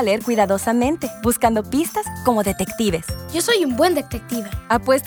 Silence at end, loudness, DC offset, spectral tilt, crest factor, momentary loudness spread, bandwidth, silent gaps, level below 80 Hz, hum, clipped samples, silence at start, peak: 0 s; -20 LUFS; under 0.1%; -4.5 dB/octave; 18 dB; 8 LU; over 20 kHz; none; -40 dBFS; none; under 0.1%; 0 s; -2 dBFS